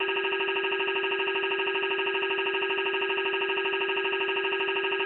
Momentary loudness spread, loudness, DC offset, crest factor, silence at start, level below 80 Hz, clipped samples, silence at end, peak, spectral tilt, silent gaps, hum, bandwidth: 0 LU; -27 LUFS; under 0.1%; 12 dB; 0 s; -76 dBFS; under 0.1%; 0 s; -16 dBFS; -5 dB/octave; none; 50 Hz at -80 dBFS; 4.1 kHz